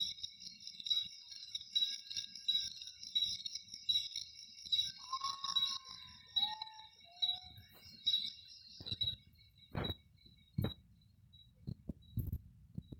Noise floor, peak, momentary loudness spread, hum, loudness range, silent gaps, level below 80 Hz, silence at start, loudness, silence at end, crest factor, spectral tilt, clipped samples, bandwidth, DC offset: -66 dBFS; -22 dBFS; 17 LU; none; 7 LU; none; -62 dBFS; 0 s; -38 LUFS; 0 s; 20 dB; -3 dB/octave; under 0.1%; 19.5 kHz; under 0.1%